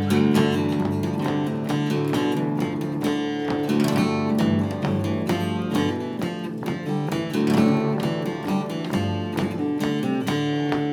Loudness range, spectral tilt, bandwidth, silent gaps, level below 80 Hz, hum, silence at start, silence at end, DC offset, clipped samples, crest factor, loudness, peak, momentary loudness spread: 1 LU; -6.5 dB/octave; 18 kHz; none; -58 dBFS; none; 0 s; 0 s; under 0.1%; under 0.1%; 18 dB; -24 LUFS; -6 dBFS; 6 LU